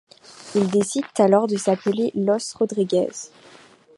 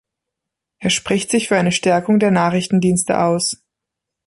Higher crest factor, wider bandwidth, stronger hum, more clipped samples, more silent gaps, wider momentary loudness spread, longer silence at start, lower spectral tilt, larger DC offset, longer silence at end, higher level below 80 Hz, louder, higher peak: about the same, 18 dB vs 16 dB; about the same, 11.5 kHz vs 11.5 kHz; neither; neither; neither; first, 11 LU vs 5 LU; second, 0.3 s vs 0.8 s; about the same, -5.5 dB/octave vs -4.5 dB/octave; neither; about the same, 0.7 s vs 0.75 s; second, -68 dBFS vs -52 dBFS; second, -21 LUFS vs -17 LUFS; about the same, -2 dBFS vs -2 dBFS